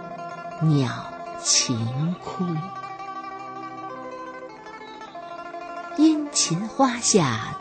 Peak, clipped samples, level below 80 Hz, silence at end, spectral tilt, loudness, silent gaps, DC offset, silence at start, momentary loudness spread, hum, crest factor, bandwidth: -4 dBFS; under 0.1%; -62 dBFS; 0 s; -4 dB/octave; -23 LUFS; none; under 0.1%; 0 s; 18 LU; none; 20 dB; 9.2 kHz